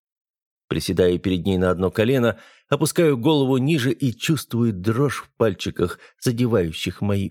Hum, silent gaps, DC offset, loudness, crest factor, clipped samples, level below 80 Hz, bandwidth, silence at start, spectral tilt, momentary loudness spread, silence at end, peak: none; none; under 0.1%; -21 LUFS; 18 dB; under 0.1%; -50 dBFS; 18 kHz; 0.7 s; -6 dB/octave; 7 LU; 0 s; -4 dBFS